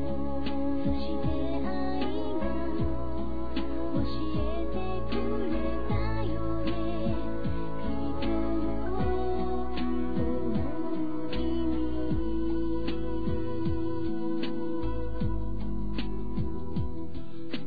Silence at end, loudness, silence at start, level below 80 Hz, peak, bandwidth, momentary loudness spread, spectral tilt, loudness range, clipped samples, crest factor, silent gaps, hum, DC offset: 0 s; -32 LUFS; 0 s; -38 dBFS; -16 dBFS; 5 kHz; 4 LU; -10 dB/octave; 2 LU; under 0.1%; 14 dB; none; none; 4%